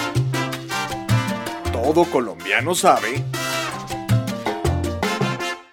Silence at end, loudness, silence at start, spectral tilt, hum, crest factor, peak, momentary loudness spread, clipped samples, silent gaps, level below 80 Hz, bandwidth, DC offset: 0.1 s; -21 LUFS; 0 s; -5 dB/octave; none; 20 dB; -2 dBFS; 9 LU; under 0.1%; none; -40 dBFS; 17.5 kHz; under 0.1%